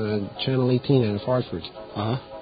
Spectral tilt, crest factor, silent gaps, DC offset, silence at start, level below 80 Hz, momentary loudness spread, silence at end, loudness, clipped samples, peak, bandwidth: -12 dB/octave; 18 dB; none; under 0.1%; 0 s; -52 dBFS; 12 LU; 0 s; -25 LUFS; under 0.1%; -6 dBFS; 5 kHz